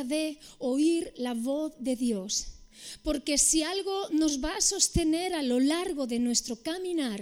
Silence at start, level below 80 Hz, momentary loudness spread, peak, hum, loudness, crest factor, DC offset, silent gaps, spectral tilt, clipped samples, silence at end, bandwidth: 0 s; -46 dBFS; 10 LU; -8 dBFS; none; -28 LUFS; 20 dB; under 0.1%; none; -2.5 dB/octave; under 0.1%; 0 s; 16.5 kHz